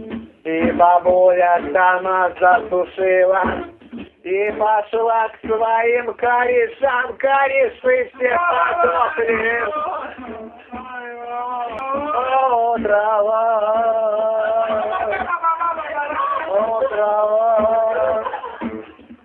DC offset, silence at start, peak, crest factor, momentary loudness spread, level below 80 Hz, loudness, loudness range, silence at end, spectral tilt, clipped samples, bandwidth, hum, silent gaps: under 0.1%; 0 s; -2 dBFS; 16 dB; 14 LU; -52 dBFS; -17 LUFS; 5 LU; 0.1 s; -8 dB/octave; under 0.1%; 4 kHz; none; none